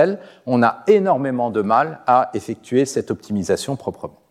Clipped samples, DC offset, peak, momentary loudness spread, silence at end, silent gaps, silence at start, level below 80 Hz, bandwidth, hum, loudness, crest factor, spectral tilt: under 0.1%; under 0.1%; -2 dBFS; 12 LU; 0.2 s; none; 0 s; -60 dBFS; 14 kHz; none; -19 LUFS; 16 dB; -6 dB/octave